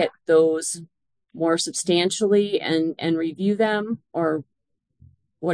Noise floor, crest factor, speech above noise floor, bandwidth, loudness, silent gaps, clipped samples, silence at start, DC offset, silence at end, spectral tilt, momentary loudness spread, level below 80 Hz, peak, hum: -72 dBFS; 18 dB; 50 dB; 10.5 kHz; -22 LUFS; none; under 0.1%; 0 s; under 0.1%; 0 s; -4 dB/octave; 10 LU; -72 dBFS; -6 dBFS; none